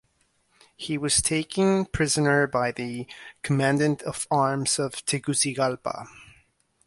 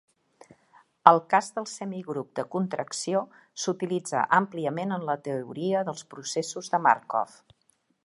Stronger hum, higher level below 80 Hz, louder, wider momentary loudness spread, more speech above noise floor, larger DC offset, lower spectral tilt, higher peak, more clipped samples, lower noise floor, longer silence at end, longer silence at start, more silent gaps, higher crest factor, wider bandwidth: neither; first, -50 dBFS vs -78 dBFS; first, -24 LUFS vs -27 LUFS; about the same, 13 LU vs 13 LU; about the same, 43 dB vs 43 dB; neither; about the same, -4 dB/octave vs -4.5 dB/octave; second, -8 dBFS vs 0 dBFS; neither; about the same, -68 dBFS vs -70 dBFS; second, 0.6 s vs 0.8 s; second, 0.8 s vs 1.05 s; neither; second, 18 dB vs 28 dB; about the same, 11.5 kHz vs 11.5 kHz